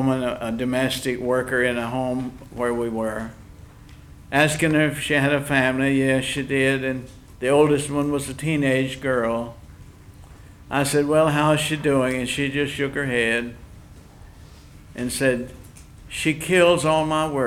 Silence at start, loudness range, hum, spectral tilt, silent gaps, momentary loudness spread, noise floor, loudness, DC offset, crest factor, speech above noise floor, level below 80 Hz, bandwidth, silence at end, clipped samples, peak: 0 s; 5 LU; none; -5 dB/octave; none; 10 LU; -44 dBFS; -22 LUFS; under 0.1%; 20 dB; 23 dB; -46 dBFS; 17.5 kHz; 0 s; under 0.1%; -2 dBFS